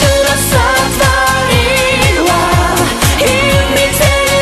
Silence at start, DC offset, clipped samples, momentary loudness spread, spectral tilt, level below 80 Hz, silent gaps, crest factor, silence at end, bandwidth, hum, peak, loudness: 0 s; under 0.1%; under 0.1%; 1 LU; -3.5 dB/octave; -22 dBFS; none; 10 dB; 0 s; 13.5 kHz; none; 0 dBFS; -10 LUFS